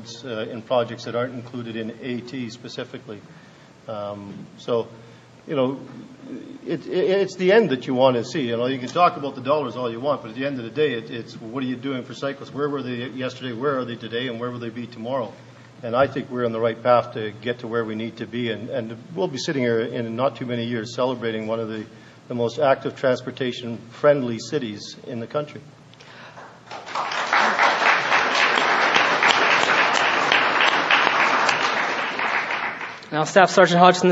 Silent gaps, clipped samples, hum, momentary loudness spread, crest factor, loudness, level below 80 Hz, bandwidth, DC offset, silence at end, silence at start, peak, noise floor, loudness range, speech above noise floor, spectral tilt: none; under 0.1%; none; 17 LU; 22 dB; -22 LUFS; -68 dBFS; 8 kHz; under 0.1%; 0 s; 0 s; 0 dBFS; -45 dBFS; 12 LU; 21 dB; -4.5 dB/octave